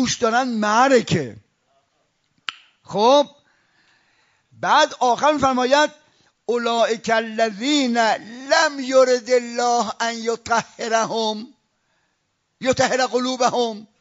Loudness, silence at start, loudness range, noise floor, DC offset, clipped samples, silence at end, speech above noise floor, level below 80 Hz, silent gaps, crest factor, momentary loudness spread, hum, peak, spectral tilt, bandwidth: -19 LUFS; 0 s; 5 LU; -71 dBFS; under 0.1%; under 0.1%; 0.2 s; 52 dB; -62 dBFS; none; 18 dB; 10 LU; none; -4 dBFS; -3.5 dB/octave; 7.8 kHz